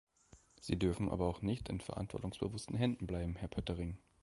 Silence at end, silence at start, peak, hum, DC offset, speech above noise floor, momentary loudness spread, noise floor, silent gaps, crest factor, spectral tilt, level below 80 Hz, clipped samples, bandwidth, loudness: 0.25 s; 0.35 s; -20 dBFS; none; under 0.1%; 27 dB; 7 LU; -66 dBFS; none; 20 dB; -7 dB/octave; -52 dBFS; under 0.1%; 11.5 kHz; -40 LUFS